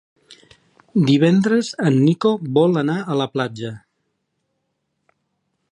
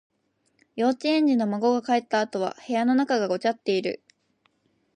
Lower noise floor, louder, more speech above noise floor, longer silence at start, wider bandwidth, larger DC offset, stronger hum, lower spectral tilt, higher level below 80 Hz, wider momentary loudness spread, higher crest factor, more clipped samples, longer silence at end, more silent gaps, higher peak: about the same, -73 dBFS vs -70 dBFS; first, -18 LUFS vs -24 LUFS; first, 56 dB vs 46 dB; first, 0.95 s vs 0.75 s; about the same, 10.5 kHz vs 9.8 kHz; neither; neither; first, -7 dB/octave vs -5.5 dB/octave; first, -66 dBFS vs -80 dBFS; first, 10 LU vs 7 LU; about the same, 16 dB vs 16 dB; neither; first, 1.95 s vs 1 s; neither; first, -4 dBFS vs -10 dBFS